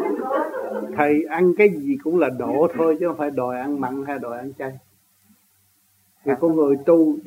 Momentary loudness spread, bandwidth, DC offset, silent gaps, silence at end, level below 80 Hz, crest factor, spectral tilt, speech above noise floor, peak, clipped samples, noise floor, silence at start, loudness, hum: 13 LU; 16 kHz; under 0.1%; none; 0 s; -68 dBFS; 18 dB; -8 dB/octave; 42 dB; -2 dBFS; under 0.1%; -61 dBFS; 0 s; -21 LUFS; none